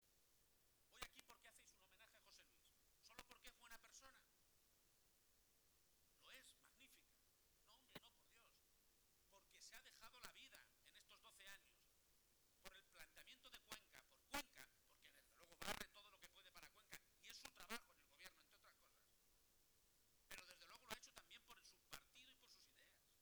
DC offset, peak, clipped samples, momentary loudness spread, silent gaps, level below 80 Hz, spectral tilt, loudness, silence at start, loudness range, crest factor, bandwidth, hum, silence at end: under 0.1%; -34 dBFS; under 0.1%; 14 LU; none; -80 dBFS; -1 dB/octave; -61 LUFS; 0 s; 11 LU; 30 dB; over 20 kHz; none; 0 s